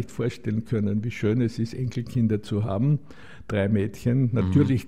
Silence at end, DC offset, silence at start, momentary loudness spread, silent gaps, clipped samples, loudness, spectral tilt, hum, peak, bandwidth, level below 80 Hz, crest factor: 0 s; 0.7%; 0 s; 7 LU; none; under 0.1%; -25 LUFS; -8.5 dB/octave; none; -8 dBFS; 12.5 kHz; -50 dBFS; 16 dB